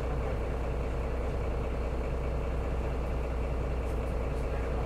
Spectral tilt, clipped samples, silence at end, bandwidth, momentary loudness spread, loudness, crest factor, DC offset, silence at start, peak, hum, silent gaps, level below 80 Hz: -7.5 dB/octave; under 0.1%; 0 s; 9.6 kHz; 1 LU; -34 LUFS; 10 dB; under 0.1%; 0 s; -20 dBFS; none; none; -34 dBFS